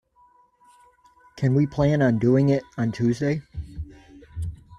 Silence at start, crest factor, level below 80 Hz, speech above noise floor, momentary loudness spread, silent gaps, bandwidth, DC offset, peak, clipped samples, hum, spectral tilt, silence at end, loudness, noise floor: 1.35 s; 16 dB; -46 dBFS; 38 dB; 19 LU; none; 9.6 kHz; under 0.1%; -8 dBFS; under 0.1%; none; -8.5 dB/octave; 0.05 s; -23 LUFS; -59 dBFS